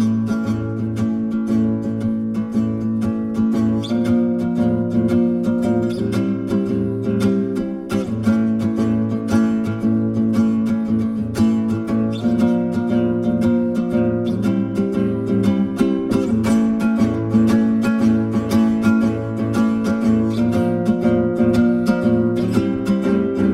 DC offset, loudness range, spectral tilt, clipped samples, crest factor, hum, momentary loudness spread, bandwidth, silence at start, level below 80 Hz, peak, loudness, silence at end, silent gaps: under 0.1%; 3 LU; -8 dB/octave; under 0.1%; 14 dB; none; 4 LU; 12 kHz; 0 s; -44 dBFS; -4 dBFS; -19 LUFS; 0 s; none